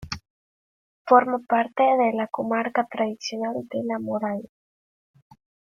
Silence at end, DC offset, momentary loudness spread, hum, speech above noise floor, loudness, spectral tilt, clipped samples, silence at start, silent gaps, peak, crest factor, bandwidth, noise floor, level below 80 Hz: 1.2 s; under 0.1%; 12 LU; none; over 67 dB; -23 LUFS; -5 dB/octave; under 0.1%; 0 s; 0.30-1.05 s; -4 dBFS; 22 dB; 7.4 kHz; under -90 dBFS; -60 dBFS